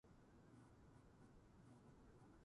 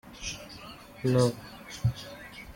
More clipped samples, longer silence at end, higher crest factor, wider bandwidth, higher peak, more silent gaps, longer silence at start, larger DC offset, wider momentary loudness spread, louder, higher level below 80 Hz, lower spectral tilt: neither; about the same, 0 s vs 0.05 s; second, 12 dB vs 20 dB; second, 11 kHz vs 16.5 kHz; second, -56 dBFS vs -12 dBFS; neither; about the same, 0.05 s vs 0.05 s; neither; second, 2 LU vs 19 LU; second, -69 LUFS vs -30 LUFS; second, -76 dBFS vs -52 dBFS; about the same, -7 dB/octave vs -6 dB/octave